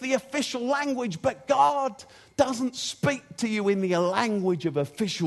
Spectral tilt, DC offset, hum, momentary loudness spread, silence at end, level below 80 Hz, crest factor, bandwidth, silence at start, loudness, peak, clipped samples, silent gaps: -5 dB/octave; under 0.1%; none; 7 LU; 0 s; -64 dBFS; 20 dB; 12.5 kHz; 0 s; -26 LUFS; -6 dBFS; under 0.1%; none